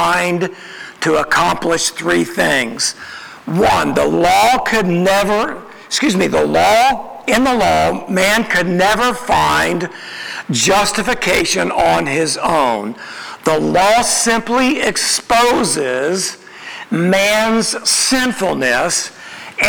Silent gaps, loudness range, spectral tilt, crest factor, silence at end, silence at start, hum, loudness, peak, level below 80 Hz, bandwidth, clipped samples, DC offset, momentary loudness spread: none; 2 LU; -3 dB/octave; 14 dB; 0 s; 0 s; none; -14 LUFS; -2 dBFS; -42 dBFS; over 20 kHz; under 0.1%; under 0.1%; 11 LU